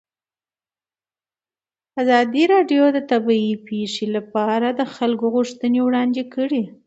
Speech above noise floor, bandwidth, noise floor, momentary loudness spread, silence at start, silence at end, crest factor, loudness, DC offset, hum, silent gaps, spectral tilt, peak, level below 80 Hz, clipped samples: over 71 dB; 8 kHz; under -90 dBFS; 8 LU; 1.95 s; 0.15 s; 18 dB; -19 LUFS; under 0.1%; none; none; -5.5 dB/octave; -2 dBFS; -72 dBFS; under 0.1%